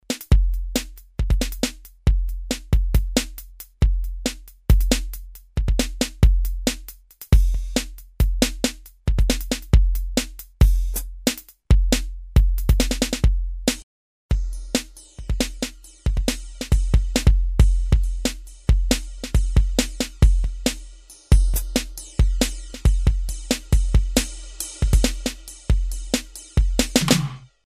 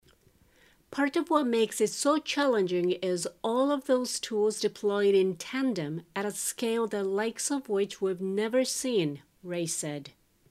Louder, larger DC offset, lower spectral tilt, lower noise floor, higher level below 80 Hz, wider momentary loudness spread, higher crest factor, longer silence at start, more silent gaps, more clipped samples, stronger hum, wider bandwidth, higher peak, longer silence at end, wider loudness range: first, -23 LUFS vs -29 LUFS; neither; about the same, -4.5 dB/octave vs -4 dB/octave; second, -42 dBFS vs -63 dBFS; first, -22 dBFS vs -72 dBFS; about the same, 10 LU vs 8 LU; about the same, 18 dB vs 18 dB; second, 0.1 s vs 0.9 s; first, 13.83-14.29 s vs none; neither; neither; about the same, 16 kHz vs 15.5 kHz; first, -2 dBFS vs -10 dBFS; second, 0.2 s vs 0.4 s; about the same, 3 LU vs 3 LU